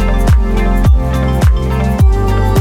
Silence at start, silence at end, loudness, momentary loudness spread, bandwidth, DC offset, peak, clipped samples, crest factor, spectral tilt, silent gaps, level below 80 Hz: 0 s; 0 s; -12 LUFS; 3 LU; 15 kHz; under 0.1%; -2 dBFS; under 0.1%; 8 dB; -7.5 dB/octave; none; -12 dBFS